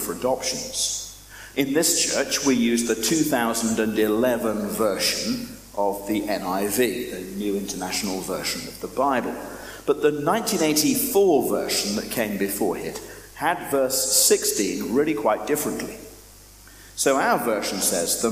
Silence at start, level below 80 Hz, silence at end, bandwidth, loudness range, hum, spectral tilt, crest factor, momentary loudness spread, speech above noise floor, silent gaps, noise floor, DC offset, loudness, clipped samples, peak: 0 s; -52 dBFS; 0 s; 15.5 kHz; 4 LU; none; -2.5 dB/octave; 18 dB; 12 LU; 24 dB; none; -47 dBFS; under 0.1%; -22 LUFS; under 0.1%; -6 dBFS